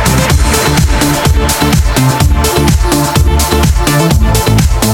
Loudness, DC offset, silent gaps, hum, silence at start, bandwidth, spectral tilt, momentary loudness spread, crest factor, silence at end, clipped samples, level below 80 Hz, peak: -9 LUFS; under 0.1%; none; none; 0 s; 18 kHz; -4.5 dB/octave; 1 LU; 8 dB; 0 s; under 0.1%; -12 dBFS; 0 dBFS